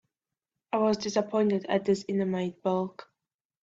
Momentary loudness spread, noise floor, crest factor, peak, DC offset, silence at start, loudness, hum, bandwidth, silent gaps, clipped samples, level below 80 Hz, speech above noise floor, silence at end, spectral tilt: 5 LU; -89 dBFS; 18 dB; -12 dBFS; under 0.1%; 0.75 s; -29 LUFS; none; 7.8 kHz; none; under 0.1%; -70 dBFS; 62 dB; 0.6 s; -6 dB/octave